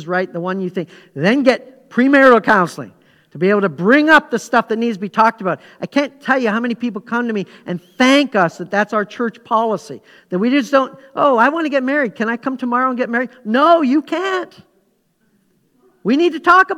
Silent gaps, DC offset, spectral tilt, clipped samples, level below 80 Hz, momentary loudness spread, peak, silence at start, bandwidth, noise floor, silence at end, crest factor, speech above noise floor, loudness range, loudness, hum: none; under 0.1%; -5.5 dB/octave; under 0.1%; -62 dBFS; 13 LU; 0 dBFS; 0 s; 13.5 kHz; -62 dBFS; 0 s; 16 dB; 46 dB; 4 LU; -16 LUFS; none